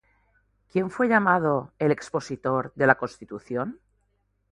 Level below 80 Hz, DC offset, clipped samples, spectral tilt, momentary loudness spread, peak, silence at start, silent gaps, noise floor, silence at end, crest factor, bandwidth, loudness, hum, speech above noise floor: -64 dBFS; under 0.1%; under 0.1%; -7 dB/octave; 12 LU; -2 dBFS; 0.75 s; none; -71 dBFS; 0.75 s; 24 dB; 11.5 kHz; -25 LUFS; 50 Hz at -55 dBFS; 47 dB